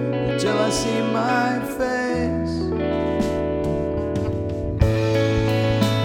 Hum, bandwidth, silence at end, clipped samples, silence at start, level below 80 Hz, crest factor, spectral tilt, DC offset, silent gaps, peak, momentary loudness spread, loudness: none; 16.5 kHz; 0 s; under 0.1%; 0 s; -34 dBFS; 18 dB; -6 dB/octave; under 0.1%; none; -4 dBFS; 4 LU; -22 LUFS